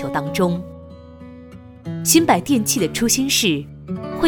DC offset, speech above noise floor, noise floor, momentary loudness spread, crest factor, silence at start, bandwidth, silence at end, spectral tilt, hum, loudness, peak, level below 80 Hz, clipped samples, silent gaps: under 0.1%; 21 dB; -40 dBFS; 22 LU; 20 dB; 0 s; over 20 kHz; 0 s; -3.5 dB/octave; none; -18 LUFS; 0 dBFS; -46 dBFS; under 0.1%; none